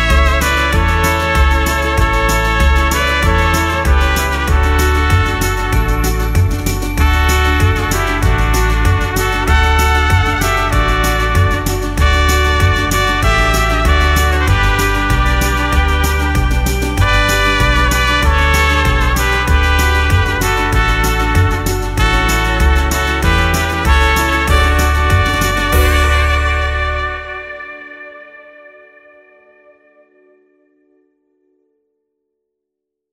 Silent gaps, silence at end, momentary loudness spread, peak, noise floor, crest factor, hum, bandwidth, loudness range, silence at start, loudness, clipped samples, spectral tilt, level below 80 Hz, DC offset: none; 4.7 s; 4 LU; 0 dBFS; -78 dBFS; 12 dB; none; 16 kHz; 2 LU; 0 s; -13 LUFS; under 0.1%; -4.5 dB/octave; -16 dBFS; under 0.1%